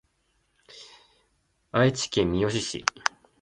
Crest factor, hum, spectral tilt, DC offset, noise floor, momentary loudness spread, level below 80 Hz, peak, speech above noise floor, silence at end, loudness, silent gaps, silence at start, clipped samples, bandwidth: 28 dB; none; -4.5 dB/octave; under 0.1%; -71 dBFS; 23 LU; -52 dBFS; -2 dBFS; 46 dB; 0.35 s; -26 LUFS; none; 0.75 s; under 0.1%; 11.5 kHz